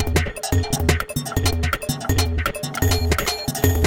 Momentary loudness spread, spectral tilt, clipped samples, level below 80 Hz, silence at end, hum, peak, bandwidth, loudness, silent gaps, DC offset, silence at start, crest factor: 4 LU; -4.5 dB/octave; under 0.1%; -28 dBFS; 0 s; none; -2 dBFS; 17.5 kHz; -22 LUFS; none; under 0.1%; 0 s; 20 dB